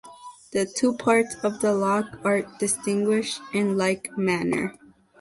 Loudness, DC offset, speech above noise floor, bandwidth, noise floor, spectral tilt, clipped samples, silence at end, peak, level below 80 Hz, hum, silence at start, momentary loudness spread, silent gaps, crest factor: -24 LUFS; under 0.1%; 21 dB; 12 kHz; -45 dBFS; -4.5 dB/octave; under 0.1%; 0.5 s; -8 dBFS; -62 dBFS; none; 0.05 s; 6 LU; none; 18 dB